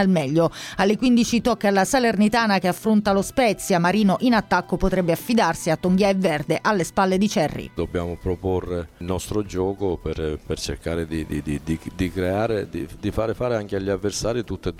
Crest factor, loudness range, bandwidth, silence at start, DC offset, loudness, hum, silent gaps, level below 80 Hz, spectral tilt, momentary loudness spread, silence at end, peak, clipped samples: 16 dB; 7 LU; 16.5 kHz; 0 s; under 0.1%; -22 LUFS; none; none; -40 dBFS; -5.5 dB/octave; 9 LU; 0 s; -6 dBFS; under 0.1%